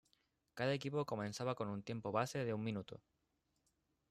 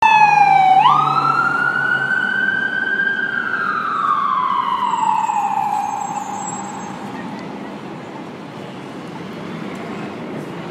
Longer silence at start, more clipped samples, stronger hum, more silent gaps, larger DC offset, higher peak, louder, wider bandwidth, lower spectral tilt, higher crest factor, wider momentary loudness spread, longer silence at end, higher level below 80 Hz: first, 0.55 s vs 0 s; neither; neither; neither; neither; second, -22 dBFS vs -2 dBFS; second, -42 LUFS vs -16 LUFS; about the same, 13.5 kHz vs 13.5 kHz; first, -6 dB/octave vs -3.5 dB/octave; about the same, 20 dB vs 16 dB; second, 11 LU vs 20 LU; first, 1.1 s vs 0 s; second, -78 dBFS vs -66 dBFS